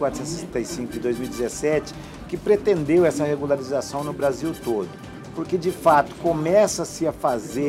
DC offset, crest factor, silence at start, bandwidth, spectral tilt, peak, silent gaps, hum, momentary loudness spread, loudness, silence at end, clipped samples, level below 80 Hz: under 0.1%; 18 dB; 0 s; 16 kHz; -5.5 dB/octave; -6 dBFS; none; none; 11 LU; -23 LUFS; 0 s; under 0.1%; -48 dBFS